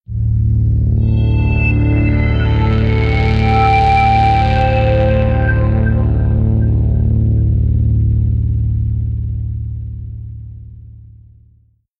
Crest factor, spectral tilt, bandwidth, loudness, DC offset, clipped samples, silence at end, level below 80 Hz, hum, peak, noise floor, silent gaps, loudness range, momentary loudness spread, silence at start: 12 dB; -9 dB/octave; 5.4 kHz; -14 LUFS; under 0.1%; under 0.1%; 1 s; -18 dBFS; none; -2 dBFS; -52 dBFS; none; 7 LU; 12 LU; 0.1 s